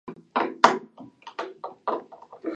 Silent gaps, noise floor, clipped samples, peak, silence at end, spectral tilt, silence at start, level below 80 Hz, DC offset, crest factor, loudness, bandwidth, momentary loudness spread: none; -46 dBFS; under 0.1%; 0 dBFS; 0 s; -3.5 dB/octave; 0.05 s; -78 dBFS; under 0.1%; 28 dB; -26 LUFS; 11 kHz; 24 LU